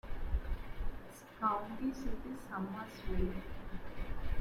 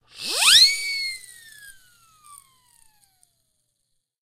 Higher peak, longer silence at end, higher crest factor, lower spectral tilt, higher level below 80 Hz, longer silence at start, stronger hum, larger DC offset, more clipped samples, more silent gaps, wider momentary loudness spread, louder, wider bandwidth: second, -22 dBFS vs -2 dBFS; second, 0 s vs 2.55 s; second, 16 dB vs 22 dB; first, -7 dB/octave vs 3 dB/octave; first, -42 dBFS vs -62 dBFS; about the same, 0.05 s vs 0.15 s; neither; neither; neither; neither; second, 12 LU vs 18 LU; second, -42 LUFS vs -16 LUFS; second, 14 kHz vs 16 kHz